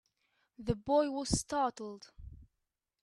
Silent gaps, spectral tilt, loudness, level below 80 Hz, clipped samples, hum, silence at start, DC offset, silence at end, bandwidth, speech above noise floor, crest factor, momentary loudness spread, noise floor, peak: none; -4.5 dB/octave; -34 LUFS; -52 dBFS; under 0.1%; none; 0.6 s; under 0.1%; 0.6 s; 12.5 kHz; 53 dB; 22 dB; 23 LU; -87 dBFS; -16 dBFS